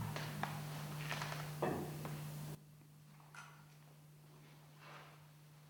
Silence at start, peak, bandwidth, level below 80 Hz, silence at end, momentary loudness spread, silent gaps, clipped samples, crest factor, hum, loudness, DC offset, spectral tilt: 0 s; -22 dBFS; 19.5 kHz; -74 dBFS; 0 s; 20 LU; none; under 0.1%; 24 dB; none; -46 LUFS; under 0.1%; -5 dB/octave